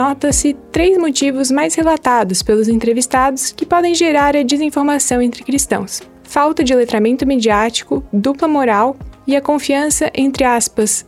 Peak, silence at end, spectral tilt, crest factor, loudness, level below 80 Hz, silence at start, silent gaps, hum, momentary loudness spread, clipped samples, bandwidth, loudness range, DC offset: -2 dBFS; 0.05 s; -3.5 dB/octave; 12 dB; -14 LUFS; -36 dBFS; 0 s; none; none; 5 LU; under 0.1%; 15.5 kHz; 1 LU; under 0.1%